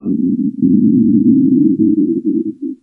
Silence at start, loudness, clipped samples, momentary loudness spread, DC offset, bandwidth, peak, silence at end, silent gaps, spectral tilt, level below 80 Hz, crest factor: 0.05 s; -13 LUFS; under 0.1%; 7 LU; under 0.1%; 0.7 kHz; 0 dBFS; 0.05 s; none; -15 dB/octave; -54 dBFS; 12 dB